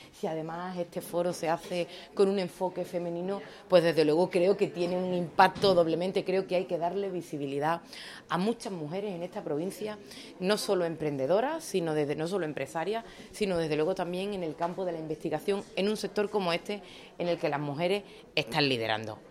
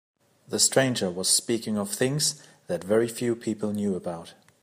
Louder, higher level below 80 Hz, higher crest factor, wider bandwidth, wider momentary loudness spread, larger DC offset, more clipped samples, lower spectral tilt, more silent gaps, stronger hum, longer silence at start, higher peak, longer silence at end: second, -30 LUFS vs -25 LUFS; about the same, -66 dBFS vs -70 dBFS; about the same, 22 dB vs 20 dB; about the same, 15.5 kHz vs 15.5 kHz; about the same, 11 LU vs 12 LU; neither; neither; first, -5.5 dB/octave vs -3 dB/octave; neither; neither; second, 0 s vs 0.5 s; about the same, -8 dBFS vs -6 dBFS; second, 0 s vs 0.3 s